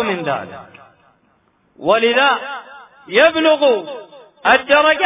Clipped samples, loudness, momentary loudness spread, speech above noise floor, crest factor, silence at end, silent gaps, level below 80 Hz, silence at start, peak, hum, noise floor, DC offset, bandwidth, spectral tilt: under 0.1%; -15 LUFS; 19 LU; 44 dB; 16 dB; 0 s; none; -56 dBFS; 0 s; 0 dBFS; none; -59 dBFS; under 0.1%; 3.9 kHz; -7.5 dB/octave